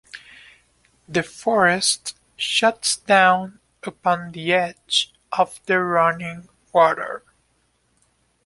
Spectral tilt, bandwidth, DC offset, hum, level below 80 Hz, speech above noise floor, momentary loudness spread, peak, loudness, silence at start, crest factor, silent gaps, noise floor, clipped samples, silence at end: -2.5 dB/octave; 11.5 kHz; under 0.1%; none; -62 dBFS; 45 dB; 18 LU; -2 dBFS; -20 LUFS; 0.15 s; 20 dB; none; -66 dBFS; under 0.1%; 1.25 s